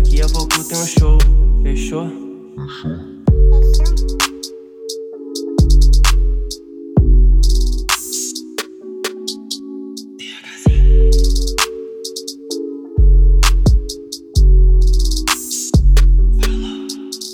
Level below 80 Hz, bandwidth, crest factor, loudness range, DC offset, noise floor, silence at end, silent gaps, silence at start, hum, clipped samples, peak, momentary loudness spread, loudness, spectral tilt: -14 dBFS; 15 kHz; 12 dB; 3 LU; under 0.1%; -32 dBFS; 0 s; none; 0 s; none; under 0.1%; -2 dBFS; 15 LU; -16 LUFS; -4.5 dB/octave